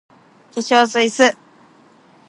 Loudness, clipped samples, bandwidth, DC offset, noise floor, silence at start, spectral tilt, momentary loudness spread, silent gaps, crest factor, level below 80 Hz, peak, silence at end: -16 LUFS; under 0.1%; 11.5 kHz; under 0.1%; -50 dBFS; 0.55 s; -2 dB/octave; 16 LU; none; 18 dB; -70 dBFS; 0 dBFS; 0.95 s